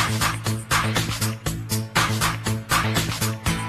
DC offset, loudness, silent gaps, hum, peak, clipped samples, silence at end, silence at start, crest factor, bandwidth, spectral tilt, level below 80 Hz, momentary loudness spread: under 0.1%; -23 LUFS; none; none; -6 dBFS; under 0.1%; 0 s; 0 s; 18 dB; 14 kHz; -3.5 dB/octave; -38 dBFS; 6 LU